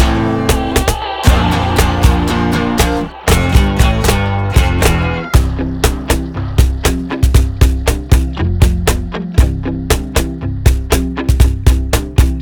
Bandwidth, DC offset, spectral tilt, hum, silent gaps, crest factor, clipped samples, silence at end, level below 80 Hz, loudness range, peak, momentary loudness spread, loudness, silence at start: over 20 kHz; under 0.1%; -5.5 dB/octave; none; none; 12 dB; 0.2%; 0 s; -16 dBFS; 2 LU; 0 dBFS; 5 LU; -14 LUFS; 0 s